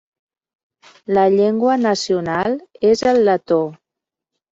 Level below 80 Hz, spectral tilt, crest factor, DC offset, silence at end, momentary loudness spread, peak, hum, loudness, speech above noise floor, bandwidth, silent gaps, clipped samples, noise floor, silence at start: -56 dBFS; -5.5 dB/octave; 14 dB; under 0.1%; 0.75 s; 7 LU; -4 dBFS; none; -17 LUFS; 69 dB; 7.8 kHz; none; under 0.1%; -85 dBFS; 1.1 s